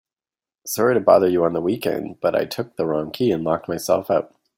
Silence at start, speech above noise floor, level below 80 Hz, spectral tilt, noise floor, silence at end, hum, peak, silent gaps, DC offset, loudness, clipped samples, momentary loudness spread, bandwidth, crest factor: 0.65 s; over 70 dB; -60 dBFS; -5.5 dB/octave; under -90 dBFS; 0.3 s; none; -2 dBFS; none; under 0.1%; -21 LUFS; under 0.1%; 10 LU; 16.5 kHz; 18 dB